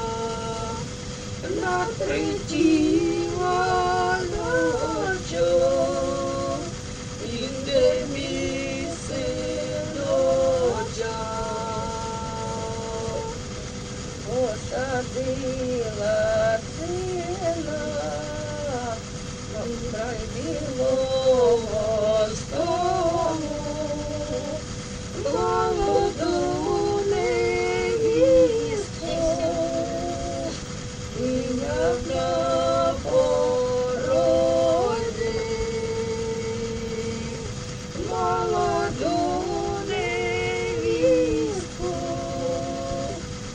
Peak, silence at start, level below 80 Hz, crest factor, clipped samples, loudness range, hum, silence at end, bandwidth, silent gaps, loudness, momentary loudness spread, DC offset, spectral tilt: -8 dBFS; 0 s; -42 dBFS; 16 dB; under 0.1%; 6 LU; none; 0 s; 10 kHz; none; -25 LUFS; 10 LU; under 0.1%; -5 dB/octave